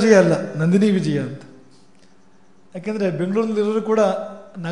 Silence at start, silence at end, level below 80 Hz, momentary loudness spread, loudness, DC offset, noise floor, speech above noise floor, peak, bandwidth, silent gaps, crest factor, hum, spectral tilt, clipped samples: 0 s; 0 s; -70 dBFS; 16 LU; -19 LUFS; 0.4%; -55 dBFS; 37 dB; 0 dBFS; 10.5 kHz; none; 20 dB; none; -7 dB/octave; under 0.1%